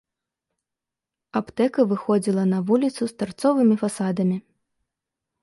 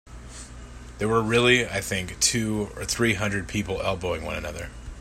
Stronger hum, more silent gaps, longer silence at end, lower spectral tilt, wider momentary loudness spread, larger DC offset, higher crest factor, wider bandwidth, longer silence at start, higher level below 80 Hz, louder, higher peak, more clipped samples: neither; neither; first, 1 s vs 0 s; first, -7 dB/octave vs -3.5 dB/octave; second, 9 LU vs 21 LU; neither; about the same, 18 dB vs 22 dB; second, 11.5 kHz vs 16 kHz; first, 1.35 s vs 0.05 s; second, -66 dBFS vs -42 dBFS; about the same, -22 LUFS vs -24 LUFS; about the same, -6 dBFS vs -4 dBFS; neither